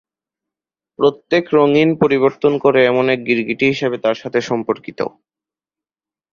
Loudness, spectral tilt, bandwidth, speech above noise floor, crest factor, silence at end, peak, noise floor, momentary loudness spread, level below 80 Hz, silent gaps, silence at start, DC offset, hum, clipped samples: -16 LUFS; -6.5 dB/octave; 7.2 kHz; over 75 dB; 16 dB; 1.25 s; -2 dBFS; under -90 dBFS; 8 LU; -58 dBFS; none; 1 s; under 0.1%; none; under 0.1%